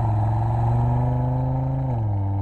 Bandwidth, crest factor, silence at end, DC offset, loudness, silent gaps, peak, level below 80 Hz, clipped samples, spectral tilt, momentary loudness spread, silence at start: 4.1 kHz; 10 dB; 0 s; under 0.1%; -23 LUFS; none; -12 dBFS; -32 dBFS; under 0.1%; -11 dB/octave; 3 LU; 0 s